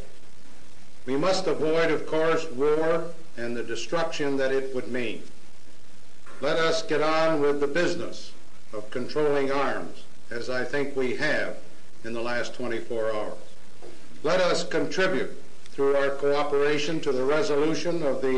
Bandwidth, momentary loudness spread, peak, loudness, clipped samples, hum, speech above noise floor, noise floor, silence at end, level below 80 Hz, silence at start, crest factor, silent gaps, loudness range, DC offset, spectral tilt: 10 kHz; 14 LU; -10 dBFS; -26 LUFS; under 0.1%; none; 28 dB; -54 dBFS; 0 s; -62 dBFS; 0 s; 16 dB; none; 5 LU; 5%; -4.5 dB/octave